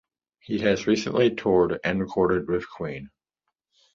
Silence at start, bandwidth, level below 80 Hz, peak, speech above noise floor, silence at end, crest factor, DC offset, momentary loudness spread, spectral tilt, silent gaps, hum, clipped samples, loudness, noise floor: 0.5 s; 7.6 kHz; -52 dBFS; -8 dBFS; 59 dB; 0.9 s; 18 dB; under 0.1%; 12 LU; -6 dB/octave; none; none; under 0.1%; -24 LUFS; -82 dBFS